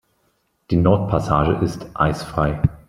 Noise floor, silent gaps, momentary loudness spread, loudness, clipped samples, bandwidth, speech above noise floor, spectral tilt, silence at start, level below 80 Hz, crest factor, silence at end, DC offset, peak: -66 dBFS; none; 5 LU; -20 LUFS; under 0.1%; 13 kHz; 48 dB; -8 dB/octave; 0.7 s; -36 dBFS; 18 dB; 0.1 s; under 0.1%; -2 dBFS